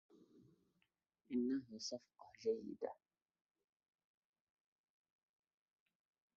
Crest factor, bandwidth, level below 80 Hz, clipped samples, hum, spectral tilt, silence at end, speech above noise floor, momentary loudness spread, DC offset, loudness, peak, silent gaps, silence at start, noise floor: 20 dB; 7.2 kHz; -90 dBFS; under 0.1%; none; -4.5 dB/octave; 3.45 s; 41 dB; 14 LU; under 0.1%; -45 LUFS; -30 dBFS; none; 0.15 s; -86 dBFS